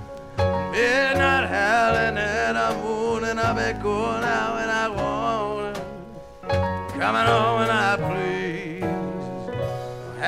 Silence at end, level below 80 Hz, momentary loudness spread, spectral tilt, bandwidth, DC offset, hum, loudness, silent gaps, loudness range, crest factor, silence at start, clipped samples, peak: 0 s; -44 dBFS; 12 LU; -5 dB/octave; 15 kHz; under 0.1%; none; -23 LUFS; none; 4 LU; 16 dB; 0 s; under 0.1%; -6 dBFS